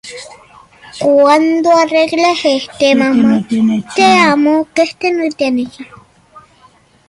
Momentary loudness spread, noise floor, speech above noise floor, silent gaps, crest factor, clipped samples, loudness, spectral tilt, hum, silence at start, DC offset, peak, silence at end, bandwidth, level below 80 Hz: 7 LU; -47 dBFS; 36 dB; none; 12 dB; under 0.1%; -11 LUFS; -4.5 dB/octave; none; 0.05 s; under 0.1%; 0 dBFS; 0.7 s; 11.5 kHz; -54 dBFS